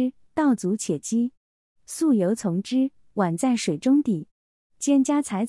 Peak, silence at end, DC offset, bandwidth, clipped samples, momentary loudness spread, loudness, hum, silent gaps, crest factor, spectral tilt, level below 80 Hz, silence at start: -10 dBFS; 0 s; under 0.1%; 12 kHz; under 0.1%; 7 LU; -24 LUFS; none; 1.37-1.76 s, 4.31-4.70 s; 14 dB; -5.5 dB/octave; -68 dBFS; 0 s